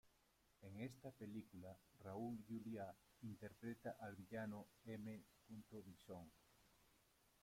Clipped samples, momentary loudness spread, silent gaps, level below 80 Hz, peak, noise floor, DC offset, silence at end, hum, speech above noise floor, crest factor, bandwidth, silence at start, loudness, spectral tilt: under 0.1%; 10 LU; none; -82 dBFS; -40 dBFS; -80 dBFS; under 0.1%; 0.15 s; none; 25 dB; 16 dB; 16.5 kHz; 0.05 s; -56 LUFS; -7 dB/octave